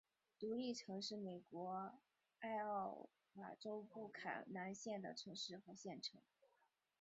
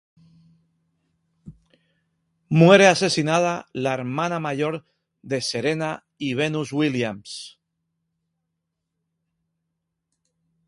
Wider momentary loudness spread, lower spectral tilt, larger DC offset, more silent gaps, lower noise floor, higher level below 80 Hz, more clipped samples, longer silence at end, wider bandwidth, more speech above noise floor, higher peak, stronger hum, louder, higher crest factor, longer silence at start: second, 9 LU vs 16 LU; second, -3 dB/octave vs -5 dB/octave; neither; neither; first, -83 dBFS vs -79 dBFS; second, under -90 dBFS vs -64 dBFS; neither; second, 0.8 s vs 3.2 s; second, 7.6 kHz vs 11.5 kHz; second, 33 dB vs 59 dB; second, -34 dBFS vs 0 dBFS; neither; second, -50 LUFS vs -21 LUFS; second, 18 dB vs 24 dB; second, 0.4 s vs 1.45 s